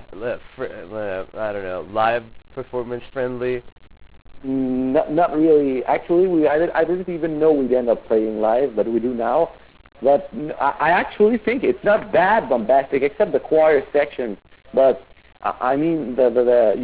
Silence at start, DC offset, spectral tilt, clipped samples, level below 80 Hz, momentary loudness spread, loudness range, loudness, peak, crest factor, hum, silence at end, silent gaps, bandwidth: 0 s; 0.3%; -10 dB/octave; under 0.1%; -50 dBFS; 13 LU; 7 LU; -20 LUFS; -6 dBFS; 14 dB; none; 0 s; 3.72-3.76 s; 4 kHz